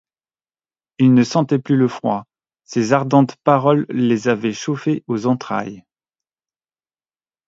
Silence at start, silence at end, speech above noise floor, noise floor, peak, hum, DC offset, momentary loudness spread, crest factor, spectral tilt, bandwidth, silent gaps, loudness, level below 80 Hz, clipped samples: 1 s; 1.7 s; over 73 dB; under -90 dBFS; 0 dBFS; none; under 0.1%; 9 LU; 18 dB; -7 dB/octave; 7.8 kHz; none; -18 LUFS; -64 dBFS; under 0.1%